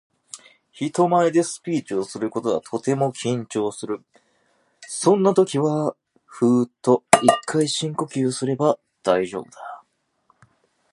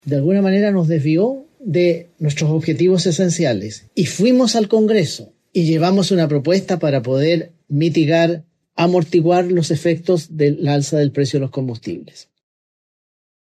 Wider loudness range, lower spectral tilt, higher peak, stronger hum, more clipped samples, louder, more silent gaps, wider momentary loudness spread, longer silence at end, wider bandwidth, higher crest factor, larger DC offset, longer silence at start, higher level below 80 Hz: first, 6 LU vs 3 LU; about the same, -5 dB/octave vs -6 dB/octave; first, 0 dBFS vs -4 dBFS; neither; neither; second, -21 LUFS vs -17 LUFS; neither; first, 16 LU vs 9 LU; second, 1.15 s vs 1.3 s; first, 16 kHz vs 13 kHz; first, 22 dB vs 14 dB; neither; first, 0.35 s vs 0.05 s; about the same, -66 dBFS vs -64 dBFS